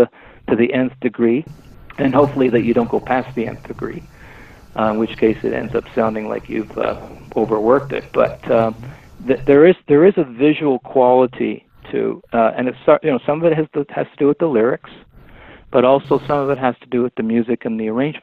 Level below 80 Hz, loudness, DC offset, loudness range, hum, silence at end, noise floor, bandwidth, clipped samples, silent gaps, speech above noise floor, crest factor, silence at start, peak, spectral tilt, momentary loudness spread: -48 dBFS; -17 LUFS; under 0.1%; 6 LU; none; 0.05 s; -41 dBFS; 6.8 kHz; under 0.1%; none; 25 dB; 16 dB; 0 s; 0 dBFS; -8.5 dB/octave; 12 LU